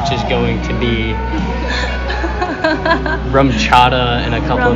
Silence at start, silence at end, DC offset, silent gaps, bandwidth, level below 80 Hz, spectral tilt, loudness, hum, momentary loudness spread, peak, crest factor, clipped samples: 0 s; 0 s; under 0.1%; none; 8.4 kHz; -22 dBFS; -6 dB/octave; -15 LUFS; none; 9 LU; 0 dBFS; 14 dB; 0.2%